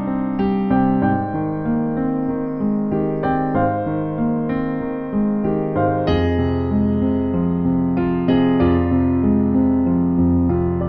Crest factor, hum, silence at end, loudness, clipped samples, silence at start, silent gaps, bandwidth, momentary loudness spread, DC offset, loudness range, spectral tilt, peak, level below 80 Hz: 14 dB; none; 0 s; -19 LUFS; under 0.1%; 0 s; none; 5 kHz; 5 LU; 0.2%; 3 LU; -11 dB/octave; -4 dBFS; -36 dBFS